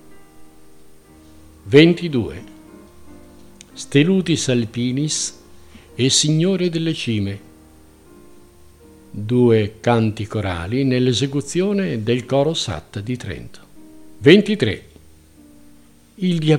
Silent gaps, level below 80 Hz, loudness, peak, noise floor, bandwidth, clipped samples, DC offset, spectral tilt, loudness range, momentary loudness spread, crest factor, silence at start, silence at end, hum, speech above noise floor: none; -50 dBFS; -18 LUFS; 0 dBFS; -49 dBFS; 15 kHz; under 0.1%; under 0.1%; -5 dB/octave; 3 LU; 17 LU; 20 dB; 0.1 s; 0 s; 50 Hz at -45 dBFS; 32 dB